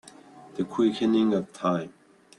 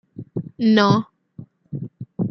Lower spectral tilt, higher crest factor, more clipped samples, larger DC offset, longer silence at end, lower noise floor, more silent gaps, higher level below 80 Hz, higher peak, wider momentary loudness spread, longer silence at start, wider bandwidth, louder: about the same, -7 dB/octave vs -7 dB/octave; about the same, 16 dB vs 20 dB; neither; neither; first, 0.5 s vs 0 s; first, -49 dBFS vs -43 dBFS; neither; second, -68 dBFS vs -60 dBFS; second, -12 dBFS vs -2 dBFS; second, 14 LU vs 19 LU; first, 0.35 s vs 0.2 s; first, 11 kHz vs 6.4 kHz; second, -26 LUFS vs -19 LUFS